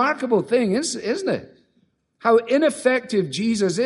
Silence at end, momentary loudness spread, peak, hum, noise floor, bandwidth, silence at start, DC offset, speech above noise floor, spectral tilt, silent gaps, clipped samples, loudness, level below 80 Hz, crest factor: 0 s; 7 LU; -4 dBFS; none; -65 dBFS; 11.5 kHz; 0 s; under 0.1%; 45 dB; -4.5 dB/octave; none; under 0.1%; -21 LUFS; -64 dBFS; 16 dB